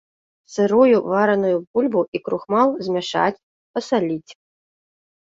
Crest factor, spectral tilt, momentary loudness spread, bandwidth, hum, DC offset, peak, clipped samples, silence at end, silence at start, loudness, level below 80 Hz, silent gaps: 18 dB; -6 dB/octave; 11 LU; 7.8 kHz; none; under 0.1%; -4 dBFS; under 0.1%; 0.9 s; 0.5 s; -20 LUFS; -66 dBFS; 1.67-1.74 s, 2.08-2.12 s, 3.43-3.74 s